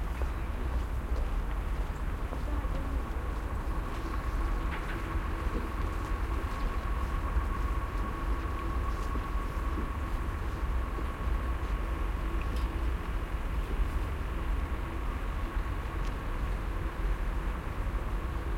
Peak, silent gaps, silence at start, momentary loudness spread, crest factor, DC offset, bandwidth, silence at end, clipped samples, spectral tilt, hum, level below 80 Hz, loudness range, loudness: -18 dBFS; none; 0 s; 2 LU; 14 dB; under 0.1%; 15.5 kHz; 0 s; under 0.1%; -6.5 dB/octave; none; -32 dBFS; 1 LU; -35 LUFS